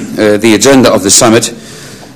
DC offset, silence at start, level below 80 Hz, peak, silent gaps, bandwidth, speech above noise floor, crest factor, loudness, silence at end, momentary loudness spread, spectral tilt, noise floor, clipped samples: under 0.1%; 0 s; -38 dBFS; 0 dBFS; none; over 20 kHz; 23 dB; 8 dB; -6 LUFS; 0.05 s; 9 LU; -3 dB/octave; -28 dBFS; 5%